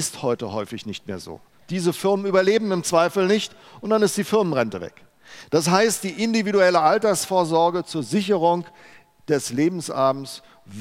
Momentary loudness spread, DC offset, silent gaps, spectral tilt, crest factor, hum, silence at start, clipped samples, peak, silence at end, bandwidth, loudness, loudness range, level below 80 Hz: 15 LU; under 0.1%; none; -4.5 dB/octave; 20 dB; none; 0 s; under 0.1%; -2 dBFS; 0 s; 16 kHz; -21 LUFS; 3 LU; -66 dBFS